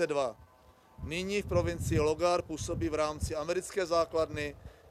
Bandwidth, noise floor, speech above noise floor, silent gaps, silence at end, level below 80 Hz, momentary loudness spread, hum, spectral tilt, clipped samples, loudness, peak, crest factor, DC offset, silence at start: 15 kHz; -60 dBFS; 29 dB; none; 0.2 s; -48 dBFS; 9 LU; none; -5 dB/octave; under 0.1%; -32 LUFS; -16 dBFS; 16 dB; under 0.1%; 0 s